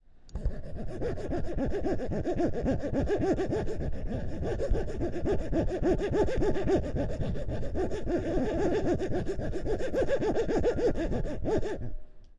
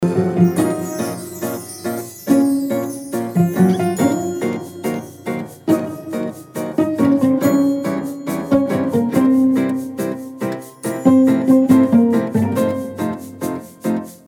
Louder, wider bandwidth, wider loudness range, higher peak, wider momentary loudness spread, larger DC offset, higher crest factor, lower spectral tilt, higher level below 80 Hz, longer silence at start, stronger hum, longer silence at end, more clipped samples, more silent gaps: second, -31 LUFS vs -18 LUFS; second, 9.8 kHz vs 17.5 kHz; about the same, 2 LU vs 4 LU; second, -16 dBFS vs 0 dBFS; second, 8 LU vs 13 LU; neither; about the same, 14 dB vs 16 dB; about the same, -7.5 dB/octave vs -7 dB/octave; first, -36 dBFS vs -58 dBFS; first, 0.15 s vs 0 s; neither; about the same, 0.05 s vs 0.1 s; neither; neither